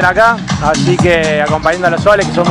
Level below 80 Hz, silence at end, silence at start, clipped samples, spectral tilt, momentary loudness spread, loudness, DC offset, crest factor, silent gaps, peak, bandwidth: -32 dBFS; 0 s; 0 s; 1%; -5 dB/octave; 3 LU; -11 LUFS; under 0.1%; 10 dB; none; 0 dBFS; 12 kHz